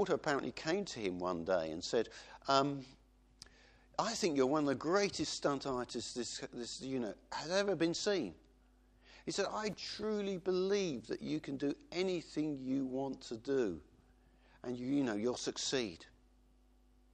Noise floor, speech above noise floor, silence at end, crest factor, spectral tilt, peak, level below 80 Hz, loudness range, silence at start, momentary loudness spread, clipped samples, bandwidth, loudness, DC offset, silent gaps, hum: -67 dBFS; 30 dB; 1.1 s; 22 dB; -4 dB/octave; -16 dBFS; -66 dBFS; 3 LU; 0 s; 11 LU; under 0.1%; 10 kHz; -37 LUFS; under 0.1%; none; none